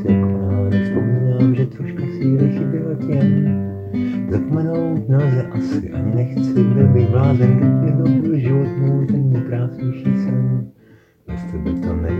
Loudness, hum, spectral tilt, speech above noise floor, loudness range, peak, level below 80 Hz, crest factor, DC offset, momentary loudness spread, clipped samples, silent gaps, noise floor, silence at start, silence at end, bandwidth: -18 LUFS; none; -11 dB/octave; 33 dB; 4 LU; -2 dBFS; -40 dBFS; 14 dB; under 0.1%; 9 LU; under 0.1%; none; -49 dBFS; 0 s; 0 s; 5.6 kHz